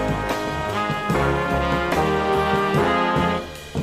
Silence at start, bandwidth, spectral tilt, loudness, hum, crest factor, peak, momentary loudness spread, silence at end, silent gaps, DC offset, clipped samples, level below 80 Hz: 0 s; 15.5 kHz; -6 dB/octave; -21 LUFS; none; 14 dB; -8 dBFS; 5 LU; 0 s; none; under 0.1%; under 0.1%; -36 dBFS